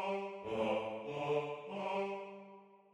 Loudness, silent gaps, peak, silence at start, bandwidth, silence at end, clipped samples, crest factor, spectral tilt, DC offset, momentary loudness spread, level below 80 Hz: -39 LUFS; none; -24 dBFS; 0 s; 11 kHz; 0.15 s; under 0.1%; 16 dB; -6 dB/octave; under 0.1%; 16 LU; -76 dBFS